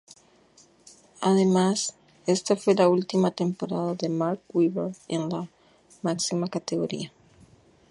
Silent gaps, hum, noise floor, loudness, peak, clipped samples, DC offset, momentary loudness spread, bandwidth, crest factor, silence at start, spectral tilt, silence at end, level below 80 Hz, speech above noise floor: none; none; -58 dBFS; -26 LUFS; -8 dBFS; under 0.1%; under 0.1%; 11 LU; 11.5 kHz; 20 dB; 1.2 s; -5.5 dB/octave; 0.85 s; -70 dBFS; 33 dB